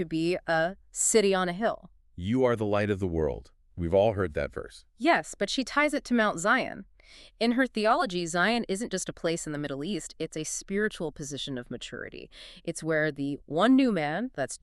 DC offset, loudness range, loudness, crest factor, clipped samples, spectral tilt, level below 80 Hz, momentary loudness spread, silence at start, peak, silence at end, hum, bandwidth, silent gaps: under 0.1%; 6 LU; -28 LUFS; 18 dB; under 0.1%; -4 dB/octave; -52 dBFS; 14 LU; 0 s; -10 dBFS; 0.05 s; none; 13.5 kHz; none